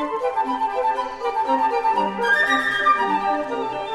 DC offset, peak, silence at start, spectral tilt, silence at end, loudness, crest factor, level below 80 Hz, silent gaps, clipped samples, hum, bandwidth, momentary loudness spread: under 0.1%; -8 dBFS; 0 s; -3.5 dB/octave; 0 s; -21 LUFS; 14 dB; -56 dBFS; none; under 0.1%; none; 13 kHz; 7 LU